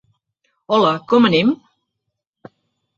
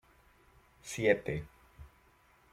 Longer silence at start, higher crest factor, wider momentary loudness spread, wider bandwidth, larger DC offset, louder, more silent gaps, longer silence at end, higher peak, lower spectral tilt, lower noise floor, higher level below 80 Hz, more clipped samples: second, 0.7 s vs 0.85 s; second, 18 dB vs 26 dB; second, 6 LU vs 22 LU; second, 7.2 kHz vs 15.5 kHz; neither; first, -16 LUFS vs -33 LUFS; neither; first, 1.4 s vs 0.65 s; first, -2 dBFS vs -12 dBFS; first, -6.5 dB/octave vs -5 dB/octave; first, -78 dBFS vs -66 dBFS; about the same, -60 dBFS vs -60 dBFS; neither